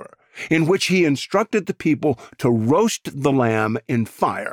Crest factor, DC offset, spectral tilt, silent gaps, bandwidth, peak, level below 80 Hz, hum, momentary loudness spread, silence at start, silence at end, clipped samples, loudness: 16 dB; under 0.1%; -5.5 dB/octave; none; 17.5 kHz; -4 dBFS; -58 dBFS; none; 6 LU; 0 s; 0 s; under 0.1%; -20 LUFS